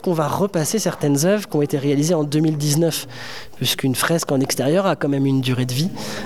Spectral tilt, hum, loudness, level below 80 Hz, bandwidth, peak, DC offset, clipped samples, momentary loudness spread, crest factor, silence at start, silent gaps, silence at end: -5 dB/octave; none; -19 LUFS; -60 dBFS; 18 kHz; -4 dBFS; 0.7%; under 0.1%; 5 LU; 14 dB; 0.05 s; none; 0 s